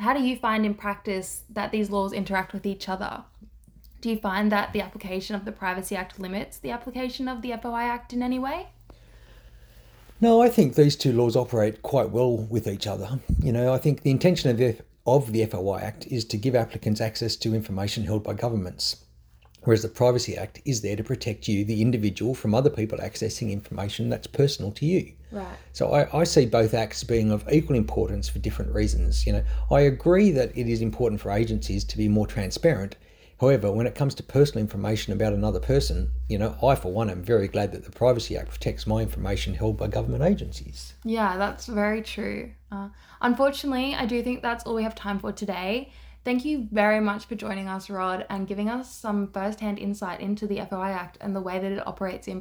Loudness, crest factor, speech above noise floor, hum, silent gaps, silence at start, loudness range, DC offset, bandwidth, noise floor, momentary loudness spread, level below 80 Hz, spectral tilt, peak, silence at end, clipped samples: -26 LUFS; 20 dB; 30 dB; none; none; 0 s; 7 LU; under 0.1%; over 20 kHz; -55 dBFS; 10 LU; -38 dBFS; -6 dB/octave; -4 dBFS; 0 s; under 0.1%